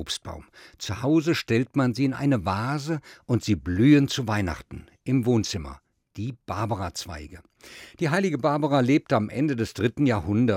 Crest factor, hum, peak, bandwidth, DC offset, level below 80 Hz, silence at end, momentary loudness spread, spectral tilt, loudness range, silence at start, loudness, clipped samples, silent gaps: 18 dB; none; -8 dBFS; 16 kHz; under 0.1%; -52 dBFS; 0 s; 16 LU; -6 dB/octave; 6 LU; 0 s; -25 LUFS; under 0.1%; none